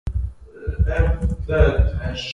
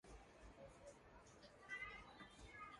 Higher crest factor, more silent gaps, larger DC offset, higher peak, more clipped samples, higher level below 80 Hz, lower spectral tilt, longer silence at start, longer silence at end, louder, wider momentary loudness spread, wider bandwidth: about the same, 18 dB vs 20 dB; neither; neither; first, -2 dBFS vs -40 dBFS; neither; first, -22 dBFS vs -70 dBFS; first, -7 dB/octave vs -3.5 dB/octave; about the same, 0.05 s vs 0.05 s; about the same, 0 s vs 0 s; first, -21 LUFS vs -58 LUFS; about the same, 13 LU vs 13 LU; second, 7.2 kHz vs 11.5 kHz